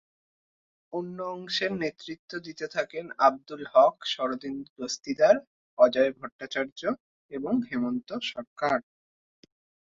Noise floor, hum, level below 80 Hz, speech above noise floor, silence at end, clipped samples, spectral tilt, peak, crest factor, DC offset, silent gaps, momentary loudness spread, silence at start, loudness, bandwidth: under -90 dBFS; none; -70 dBFS; over 63 dB; 1.1 s; under 0.1%; -4 dB/octave; -8 dBFS; 22 dB; under 0.1%; 2.19-2.28 s, 4.70-4.76 s, 5.47-5.77 s, 6.32-6.39 s, 6.72-6.76 s, 7.00-7.29 s, 8.47-8.56 s; 16 LU; 0.95 s; -28 LUFS; 7.6 kHz